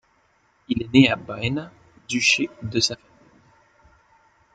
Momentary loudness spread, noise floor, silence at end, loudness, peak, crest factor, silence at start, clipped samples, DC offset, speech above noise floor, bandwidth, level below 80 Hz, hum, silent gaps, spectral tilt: 13 LU; -63 dBFS; 1.6 s; -21 LUFS; -2 dBFS; 22 dB; 0.7 s; under 0.1%; under 0.1%; 42 dB; 9.2 kHz; -54 dBFS; none; none; -4 dB/octave